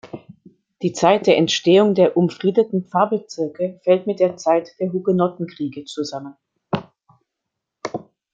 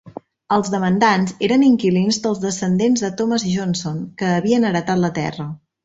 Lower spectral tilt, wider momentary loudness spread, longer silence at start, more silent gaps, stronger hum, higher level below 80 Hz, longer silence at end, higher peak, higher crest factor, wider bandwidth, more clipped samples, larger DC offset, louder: about the same, -5.5 dB/octave vs -5.5 dB/octave; first, 16 LU vs 9 LU; about the same, 0.05 s vs 0.05 s; neither; neither; second, -66 dBFS vs -56 dBFS; about the same, 0.35 s vs 0.3 s; about the same, -2 dBFS vs -2 dBFS; about the same, 18 dB vs 16 dB; about the same, 8 kHz vs 8 kHz; neither; neither; about the same, -19 LUFS vs -18 LUFS